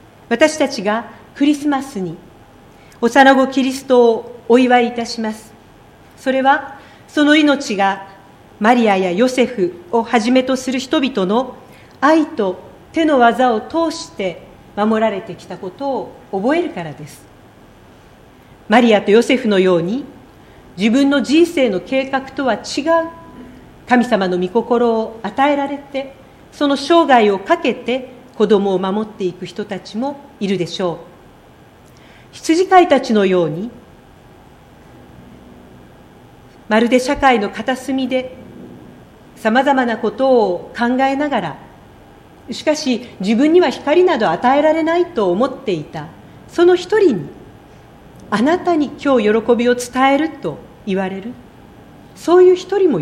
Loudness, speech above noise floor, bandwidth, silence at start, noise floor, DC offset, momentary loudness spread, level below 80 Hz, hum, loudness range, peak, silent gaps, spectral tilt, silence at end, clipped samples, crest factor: -15 LUFS; 29 dB; 14.5 kHz; 0.3 s; -44 dBFS; under 0.1%; 15 LU; -52 dBFS; none; 5 LU; 0 dBFS; none; -5 dB/octave; 0 s; under 0.1%; 16 dB